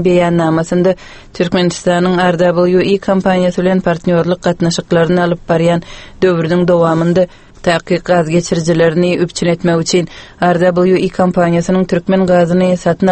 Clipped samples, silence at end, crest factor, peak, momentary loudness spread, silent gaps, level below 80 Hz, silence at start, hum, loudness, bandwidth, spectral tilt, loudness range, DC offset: under 0.1%; 0 s; 12 dB; 0 dBFS; 4 LU; none; -40 dBFS; 0 s; none; -13 LUFS; 8.6 kHz; -6.5 dB/octave; 1 LU; under 0.1%